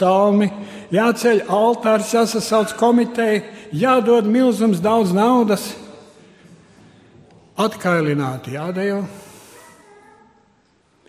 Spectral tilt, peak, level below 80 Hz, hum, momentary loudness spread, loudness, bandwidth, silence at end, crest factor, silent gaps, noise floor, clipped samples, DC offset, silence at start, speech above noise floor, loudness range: -5.5 dB/octave; -2 dBFS; -62 dBFS; none; 11 LU; -17 LUFS; 15.5 kHz; 1.85 s; 16 dB; none; -59 dBFS; under 0.1%; under 0.1%; 0 s; 42 dB; 7 LU